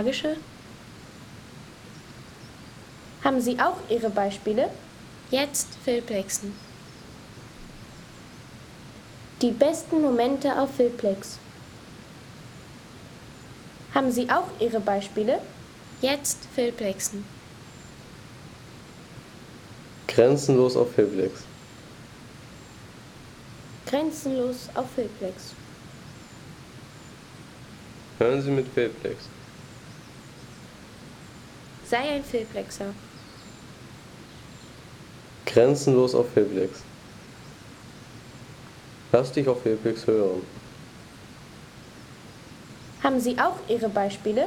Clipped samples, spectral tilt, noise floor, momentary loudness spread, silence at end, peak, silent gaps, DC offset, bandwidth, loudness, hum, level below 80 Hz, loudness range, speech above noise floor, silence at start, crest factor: under 0.1%; -5 dB/octave; -45 dBFS; 22 LU; 0 s; -6 dBFS; none; under 0.1%; 18.5 kHz; -25 LUFS; none; -58 dBFS; 10 LU; 21 dB; 0 s; 22 dB